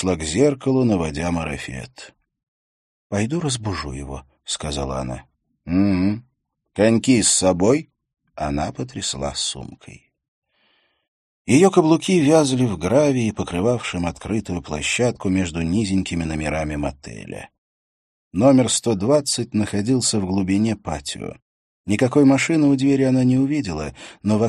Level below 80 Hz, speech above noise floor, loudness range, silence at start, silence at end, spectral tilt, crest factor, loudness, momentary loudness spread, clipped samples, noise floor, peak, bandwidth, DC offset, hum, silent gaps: -42 dBFS; 44 dB; 9 LU; 0 s; 0 s; -5 dB/octave; 20 dB; -20 LUFS; 16 LU; under 0.1%; -64 dBFS; 0 dBFS; 12.5 kHz; under 0.1%; none; 2.48-3.10 s, 10.28-10.42 s, 11.08-11.45 s, 17.58-18.31 s, 21.42-21.84 s